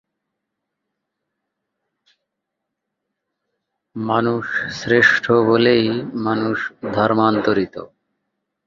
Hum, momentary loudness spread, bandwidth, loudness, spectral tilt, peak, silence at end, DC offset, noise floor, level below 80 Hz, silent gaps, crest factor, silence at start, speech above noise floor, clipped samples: none; 11 LU; 7.4 kHz; -17 LUFS; -6 dB/octave; -2 dBFS; 0.8 s; under 0.1%; -80 dBFS; -58 dBFS; none; 20 dB; 3.95 s; 62 dB; under 0.1%